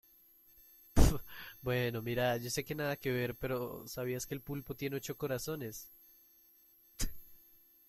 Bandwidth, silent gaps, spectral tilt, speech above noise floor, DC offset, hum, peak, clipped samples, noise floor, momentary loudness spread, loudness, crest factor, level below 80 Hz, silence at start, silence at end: 16.5 kHz; none; -5 dB/octave; 28 dB; under 0.1%; none; -10 dBFS; under 0.1%; -65 dBFS; 13 LU; -37 LUFS; 26 dB; -42 dBFS; 0.95 s; 0.55 s